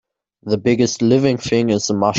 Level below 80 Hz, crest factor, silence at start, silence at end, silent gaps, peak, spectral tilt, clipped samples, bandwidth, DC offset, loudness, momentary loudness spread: -52 dBFS; 14 dB; 0.45 s; 0 s; none; -2 dBFS; -5.5 dB/octave; under 0.1%; 8 kHz; under 0.1%; -17 LUFS; 6 LU